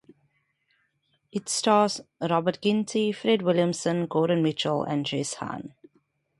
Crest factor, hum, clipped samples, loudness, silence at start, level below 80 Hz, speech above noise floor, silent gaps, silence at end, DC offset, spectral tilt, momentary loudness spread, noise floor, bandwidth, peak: 20 dB; none; under 0.1%; -26 LUFS; 1.35 s; -70 dBFS; 47 dB; none; 0.7 s; under 0.1%; -5 dB/octave; 12 LU; -72 dBFS; 11.5 kHz; -8 dBFS